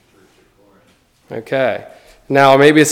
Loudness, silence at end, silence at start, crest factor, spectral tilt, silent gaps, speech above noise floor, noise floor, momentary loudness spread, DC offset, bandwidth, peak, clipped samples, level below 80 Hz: -12 LUFS; 0 s; 1.3 s; 16 dB; -4.5 dB/octave; none; 42 dB; -54 dBFS; 21 LU; under 0.1%; 16.5 kHz; 0 dBFS; 0.2%; -58 dBFS